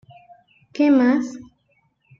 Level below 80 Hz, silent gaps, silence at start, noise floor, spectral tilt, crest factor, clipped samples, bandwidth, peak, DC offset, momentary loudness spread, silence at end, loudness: -66 dBFS; none; 0.75 s; -65 dBFS; -5.5 dB/octave; 16 dB; under 0.1%; 7.4 kHz; -6 dBFS; under 0.1%; 22 LU; 0.8 s; -18 LUFS